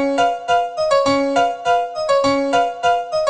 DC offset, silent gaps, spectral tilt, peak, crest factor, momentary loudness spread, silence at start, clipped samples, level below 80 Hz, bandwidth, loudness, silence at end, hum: 0.2%; none; -3.5 dB/octave; -4 dBFS; 12 dB; 3 LU; 0 s; under 0.1%; -52 dBFS; 9.6 kHz; -17 LUFS; 0 s; none